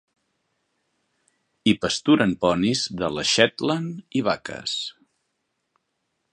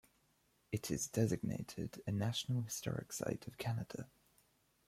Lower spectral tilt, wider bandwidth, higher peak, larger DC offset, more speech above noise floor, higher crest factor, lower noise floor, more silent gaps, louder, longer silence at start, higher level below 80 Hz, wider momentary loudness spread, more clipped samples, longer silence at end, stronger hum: about the same, -4 dB/octave vs -5 dB/octave; second, 10 kHz vs 16 kHz; first, 0 dBFS vs -20 dBFS; neither; first, 54 dB vs 36 dB; about the same, 24 dB vs 20 dB; about the same, -76 dBFS vs -76 dBFS; neither; first, -22 LUFS vs -41 LUFS; first, 1.65 s vs 0.7 s; first, -56 dBFS vs -68 dBFS; about the same, 9 LU vs 9 LU; neither; first, 1.4 s vs 0.8 s; neither